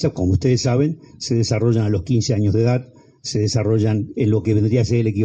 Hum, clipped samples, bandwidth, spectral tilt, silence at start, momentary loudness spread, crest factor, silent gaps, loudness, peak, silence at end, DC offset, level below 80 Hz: none; under 0.1%; 8.4 kHz; -6.5 dB/octave; 0 s; 5 LU; 12 dB; none; -19 LUFS; -6 dBFS; 0 s; under 0.1%; -44 dBFS